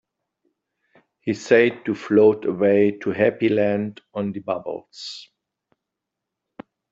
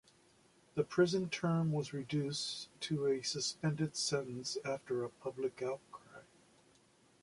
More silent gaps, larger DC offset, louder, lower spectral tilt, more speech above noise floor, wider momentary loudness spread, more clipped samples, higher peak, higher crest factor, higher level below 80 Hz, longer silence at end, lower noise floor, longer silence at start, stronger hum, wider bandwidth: neither; neither; first, -20 LUFS vs -37 LUFS; first, -6.5 dB/octave vs -5 dB/octave; first, 63 dB vs 32 dB; first, 16 LU vs 10 LU; neither; first, -4 dBFS vs -18 dBFS; about the same, 20 dB vs 20 dB; first, -66 dBFS vs -74 dBFS; first, 1.7 s vs 1 s; first, -83 dBFS vs -69 dBFS; first, 1.25 s vs 0.75 s; neither; second, 7.8 kHz vs 11.5 kHz